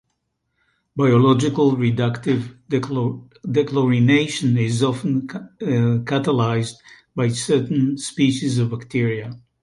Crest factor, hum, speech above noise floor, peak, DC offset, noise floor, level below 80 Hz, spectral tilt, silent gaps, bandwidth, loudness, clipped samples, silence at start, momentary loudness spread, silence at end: 16 dB; none; 54 dB; -4 dBFS; under 0.1%; -73 dBFS; -56 dBFS; -6.5 dB/octave; none; 11.5 kHz; -20 LUFS; under 0.1%; 0.95 s; 9 LU; 0.25 s